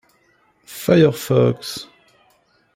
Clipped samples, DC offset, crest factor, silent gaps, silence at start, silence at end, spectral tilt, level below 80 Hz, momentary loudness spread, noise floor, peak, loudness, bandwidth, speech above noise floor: under 0.1%; under 0.1%; 18 dB; none; 0.7 s; 0.9 s; -6.5 dB/octave; -56 dBFS; 17 LU; -59 dBFS; -2 dBFS; -17 LUFS; 16.5 kHz; 43 dB